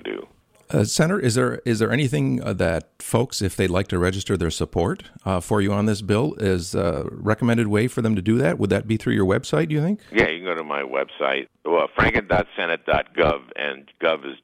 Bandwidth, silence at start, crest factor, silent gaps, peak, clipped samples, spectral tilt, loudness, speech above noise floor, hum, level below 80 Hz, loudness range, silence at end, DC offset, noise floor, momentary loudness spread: 16 kHz; 0.05 s; 18 dB; none; -4 dBFS; under 0.1%; -5.5 dB/octave; -22 LUFS; 25 dB; none; -44 dBFS; 2 LU; 0.1 s; under 0.1%; -47 dBFS; 7 LU